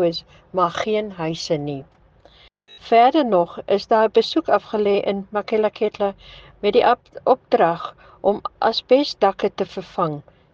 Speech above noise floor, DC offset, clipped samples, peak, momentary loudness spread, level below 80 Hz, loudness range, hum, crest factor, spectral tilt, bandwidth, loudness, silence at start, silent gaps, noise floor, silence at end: 32 dB; under 0.1%; under 0.1%; -4 dBFS; 10 LU; -56 dBFS; 2 LU; none; 18 dB; -5.5 dB/octave; 7.6 kHz; -20 LUFS; 0 s; none; -51 dBFS; 0.35 s